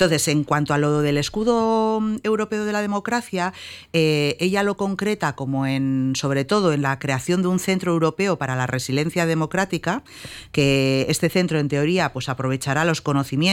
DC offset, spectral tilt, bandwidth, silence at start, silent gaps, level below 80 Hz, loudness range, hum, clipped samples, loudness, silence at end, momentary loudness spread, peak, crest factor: under 0.1%; -5 dB/octave; 16.5 kHz; 0 s; none; -52 dBFS; 1 LU; none; under 0.1%; -21 LUFS; 0 s; 5 LU; -6 dBFS; 14 dB